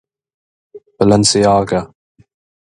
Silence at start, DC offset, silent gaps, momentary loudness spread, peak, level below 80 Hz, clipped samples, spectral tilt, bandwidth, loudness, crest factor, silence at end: 0.75 s; under 0.1%; none; 10 LU; 0 dBFS; -44 dBFS; under 0.1%; -4.5 dB/octave; 11 kHz; -13 LUFS; 16 dB; 0.85 s